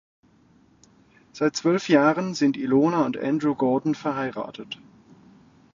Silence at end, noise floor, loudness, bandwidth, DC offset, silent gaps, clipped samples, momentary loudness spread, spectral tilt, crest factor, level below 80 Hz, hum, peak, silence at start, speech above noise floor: 1 s; -58 dBFS; -23 LUFS; 7.6 kHz; under 0.1%; none; under 0.1%; 15 LU; -6 dB/octave; 20 dB; -68 dBFS; none; -4 dBFS; 1.35 s; 35 dB